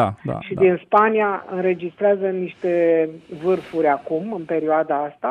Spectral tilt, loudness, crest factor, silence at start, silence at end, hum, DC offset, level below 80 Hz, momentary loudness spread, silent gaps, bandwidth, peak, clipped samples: -8.5 dB/octave; -20 LUFS; 16 dB; 0 s; 0 s; none; under 0.1%; -60 dBFS; 9 LU; none; 5.4 kHz; -4 dBFS; under 0.1%